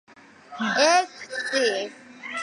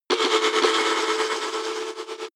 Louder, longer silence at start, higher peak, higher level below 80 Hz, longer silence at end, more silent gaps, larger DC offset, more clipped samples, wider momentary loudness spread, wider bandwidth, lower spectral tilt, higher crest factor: about the same, -23 LUFS vs -22 LUFS; first, 0.5 s vs 0.1 s; about the same, -6 dBFS vs -6 dBFS; about the same, -80 dBFS vs -84 dBFS; about the same, 0 s vs 0.05 s; neither; neither; neither; first, 18 LU vs 11 LU; second, 11.5 kHz vs 14 kHz; first, -1.5 dB/octave vs 0 dB/octave; about the same, 18 dB vs 18 dB